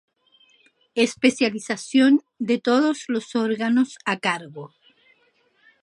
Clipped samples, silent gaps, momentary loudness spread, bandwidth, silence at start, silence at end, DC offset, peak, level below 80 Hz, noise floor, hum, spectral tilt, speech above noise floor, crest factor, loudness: under 0.1%; none; 11 LU; 11.5 kHz; 0.95 s; 1.15 s; under 0.1%; -2 dBFS; -74 dBFS; -64 dBFS; none; -4 dB/octave; 42 dB; 20 dB; -22 LUFS